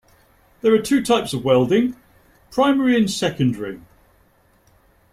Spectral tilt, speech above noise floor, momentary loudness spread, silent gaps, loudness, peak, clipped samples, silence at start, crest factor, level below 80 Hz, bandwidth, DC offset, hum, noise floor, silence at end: -5.5 dB/octave; 39 dB; 11 LU; none; -19 LUFS; -4 dBFS; under 0.1%; 0.65 s; 16 dB; -54 dBFS; 16 kHz; under 0.1%; none; -57 dBFS; 1.35 s